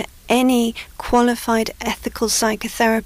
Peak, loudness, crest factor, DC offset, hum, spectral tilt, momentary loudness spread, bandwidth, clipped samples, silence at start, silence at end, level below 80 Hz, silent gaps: -6 dBFS; -19 LUFS; 12 dB; under 0.1%; none; -3 dB/octave; 8 LU; 16 kHz; under 0.1%; 0 s; 0 s; -40 dBFS; none